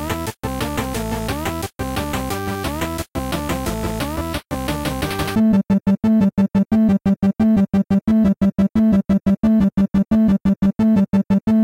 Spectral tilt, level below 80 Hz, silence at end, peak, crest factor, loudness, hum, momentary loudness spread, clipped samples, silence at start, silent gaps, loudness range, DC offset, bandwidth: -6.5 dB/octave; -34 dBFS; 0 s; -6 dBFS; 10 dB; -19 LUFS; none; 9 LU; under 0.1%; 0 s; none; 7 LU; under 0.1%; 16.5 kHz